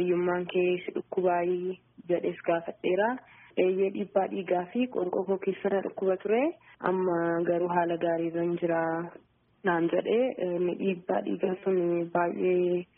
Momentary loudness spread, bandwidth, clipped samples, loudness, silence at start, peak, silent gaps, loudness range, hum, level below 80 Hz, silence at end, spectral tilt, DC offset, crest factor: 5 LU; 3.6 kHz; under 0.1%; -29 LUFS; 0 s; -10 dBFS; none; 1 LU; none; -72 dBFS; 0.15 s; -3.5 dB/octave; under 0.1%; 18 dB